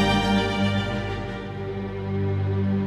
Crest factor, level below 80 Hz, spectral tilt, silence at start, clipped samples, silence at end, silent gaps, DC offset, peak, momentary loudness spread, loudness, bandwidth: 14 dB; -40 dBFS; -6.5 dB/octave; 0 s; under 0.1%; 0 s; none; under 0.1%; -10 dBFS; 10 LU; -25 LUFS; 12.5 kHz